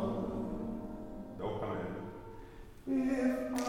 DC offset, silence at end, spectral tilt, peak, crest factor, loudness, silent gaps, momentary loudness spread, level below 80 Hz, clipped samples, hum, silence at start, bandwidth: under 0.1%; 0 s; -6.5 dB/octave; -22 dBFS; 16 dB; -38 LUFS; none; 17 LU; -54 dBFS; under 0.1%; none; 0 s; 17 kHz